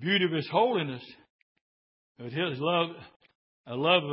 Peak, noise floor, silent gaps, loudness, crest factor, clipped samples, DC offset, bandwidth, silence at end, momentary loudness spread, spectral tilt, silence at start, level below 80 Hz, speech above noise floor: -8 dBFS; under -90 dBFS; 1.30-2.15 s, 3.16-3.20 s, 3.35-3.64 s; -28 LUFS; 22 dB; under 0.1%; under 0.1%; 5.8 kHz; 0 s; 19 LU; -9.5 dB/octave; 0 s; -76 dBFS; over 62 dB